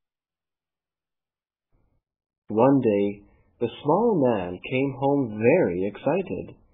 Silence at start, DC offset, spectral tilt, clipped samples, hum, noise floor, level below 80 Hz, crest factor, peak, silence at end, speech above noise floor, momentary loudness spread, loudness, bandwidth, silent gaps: 2.5 s; under 0.1%; -11.5 dB/octave; under 0.1%; none; under -90 dBFS; -60 dBFS; 20 dB; -4 dBFS; 0.2 s; over 67 dB; 11 LU; -23 LUFS; 3.9 kHz; none